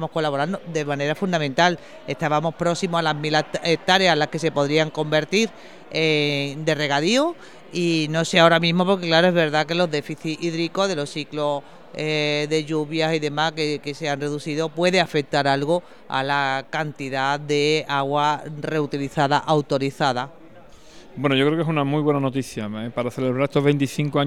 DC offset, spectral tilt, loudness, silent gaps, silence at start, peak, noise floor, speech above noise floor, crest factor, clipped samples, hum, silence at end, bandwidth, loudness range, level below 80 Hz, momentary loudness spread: 0.4%; -5 dB/octave; -22 LUFS; none; 0 s; -2 dBFS; -47 dBFS; 25 dB; 20 dB; under 0.1%; none; 0 s; 14 kHz; 4 LU; -62 dBFS; 9 LU